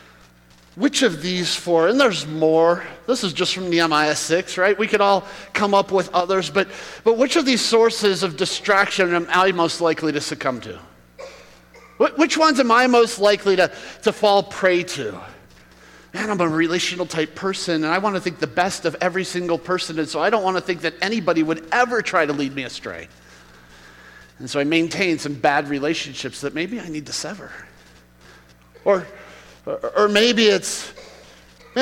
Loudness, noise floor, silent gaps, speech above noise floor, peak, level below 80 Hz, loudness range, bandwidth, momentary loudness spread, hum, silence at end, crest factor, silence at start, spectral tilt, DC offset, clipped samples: -19 LUFS; -51 dBFS; none; 31 dB; -4 dBFS; -56 dBFS; 6 LU; 16.5 kHz; 12 LU; none; 0 s; 18 dB; 0.75 s; -3.5 dB/octave; under 0.1%; under 0.1%